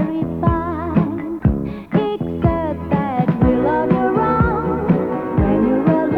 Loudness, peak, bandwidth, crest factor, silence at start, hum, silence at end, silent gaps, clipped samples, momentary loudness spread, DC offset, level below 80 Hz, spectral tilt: -18 LUFS; -2 dBFS; 4.8 kHz; 16 dB; 0 s; none; 0 s; none; under 0.1%; 5 LU; under 0.1%; -30 dBFS; -10.5 dB/octave